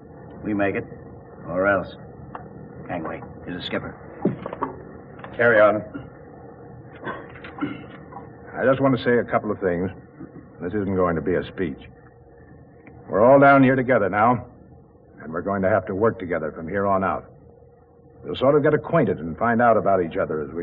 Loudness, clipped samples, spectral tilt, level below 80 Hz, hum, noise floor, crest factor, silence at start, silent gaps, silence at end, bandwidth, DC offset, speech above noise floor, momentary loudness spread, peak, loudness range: -21 LUFS; under 0.1%; -5.5 dB/octave; -52 dBFS; none; -51 dBFS; 18 dB; 0.05 s; none; 0 s; 4.9 kHz; under 0.1%; 30 dB; 23 LU; -6 dBFS; 9 LU